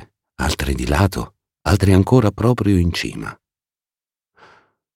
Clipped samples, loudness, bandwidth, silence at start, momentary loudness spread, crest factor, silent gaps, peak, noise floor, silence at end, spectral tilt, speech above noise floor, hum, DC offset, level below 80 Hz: under 0.1%; -18 LUFS; 16.5 kHz; 0 s; 15 LU; 18 dB; none; -2 dBFS; under -90 dBFS; 1.6 s; -6.5 dB/octave; over 74 dB; none; under 0.1%; -32 dBFS